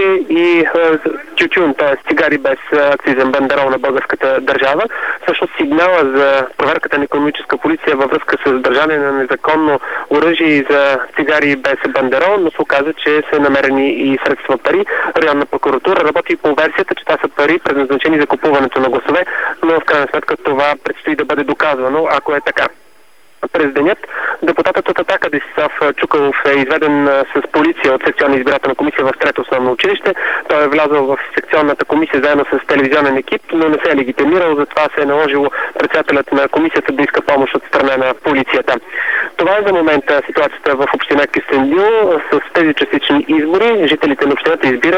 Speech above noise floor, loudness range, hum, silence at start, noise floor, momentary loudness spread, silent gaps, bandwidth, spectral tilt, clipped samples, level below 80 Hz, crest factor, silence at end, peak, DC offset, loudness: 37 dB; 2 LU; none; 0 s; -49 dBFS; 4 LU; none; over 20 kHz; -5.5 dB/octave; under 0.1%; -52 dBFS; 12 dB; 0 s; 0 dBFS; 0.7%; -13 LUFS